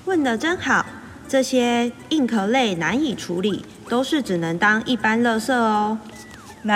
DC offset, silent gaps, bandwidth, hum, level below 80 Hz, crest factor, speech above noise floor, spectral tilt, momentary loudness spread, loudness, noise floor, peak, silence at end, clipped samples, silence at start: under 0.1%; none; 15.5 kHz; none; -56 dBFS; 16 dB; 20 dB; -4.5 dB/octave; 12 LU; -21 LUFS; -40 dBFS; -4 dBFS; 0 s; under 0.1%; 0.05 s